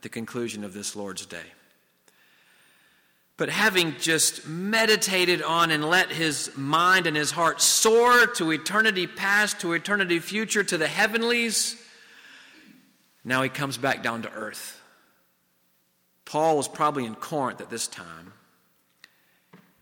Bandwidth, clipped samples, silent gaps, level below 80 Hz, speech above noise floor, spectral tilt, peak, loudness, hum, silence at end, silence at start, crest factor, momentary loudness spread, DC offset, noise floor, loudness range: 19 kHz; under 0.1%; none; -70 dBFS; 43 dB; -2 dB/octave; -8 dBFS; -23 LUFS; none; 0.25 s; 0.05 s; 18 dB; 15 LU; under 0.1%; -68 dBFS; 10 LU